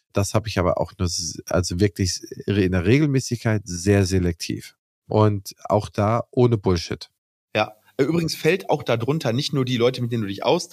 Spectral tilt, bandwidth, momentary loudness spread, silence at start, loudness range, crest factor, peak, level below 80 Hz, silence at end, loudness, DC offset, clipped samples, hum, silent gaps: -5.5 dB/octave; 15.5 kHz; 7 LU; 0.15 s; 2 LU; 16 dB; -4 dBFS; -46 dBFS; 0.05 s; -22 LUFS; under 0.1%; under 0.1%; none; 4.79-5.02 s, 7.18-7.48 s